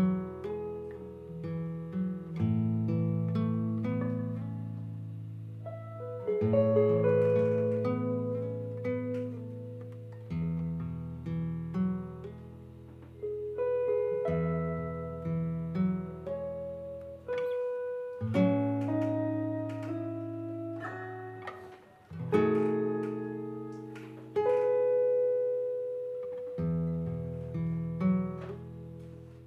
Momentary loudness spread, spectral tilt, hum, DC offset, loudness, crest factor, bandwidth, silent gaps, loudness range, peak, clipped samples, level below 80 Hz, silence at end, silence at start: 16 LU; -10 dB/octave; none; under 0.1%; -33 LUFS; 20 dB; 6 kHz; none; 7 LU; -12 dBFS; under 0.1%; -62 dBFS; 0 s; 0 s